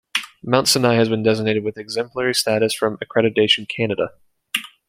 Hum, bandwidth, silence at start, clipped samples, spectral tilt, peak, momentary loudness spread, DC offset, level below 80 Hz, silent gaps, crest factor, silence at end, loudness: none; 16.5 kHz; 0.15 s; under 0.1%; -4 dB/octave; 0 dBFS; 10 LU; under 0.1%; -60 dBFS; none; 20 dB; 0.2 s; -19 LUFS